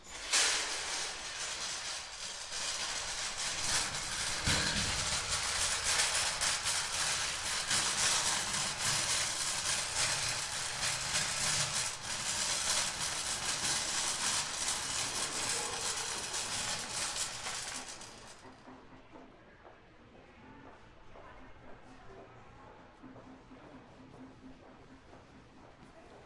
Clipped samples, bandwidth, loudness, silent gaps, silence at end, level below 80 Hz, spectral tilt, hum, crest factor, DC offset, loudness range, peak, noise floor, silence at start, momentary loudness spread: under 0.1%; 12 kHz; -32 LUFS; none; 0 s; -58 dBFS; 0 dB/octave; none; 22 dB; under 0.1%; 7 LU; -16 dBFS; -57 dBFS; 0 s; 11 LU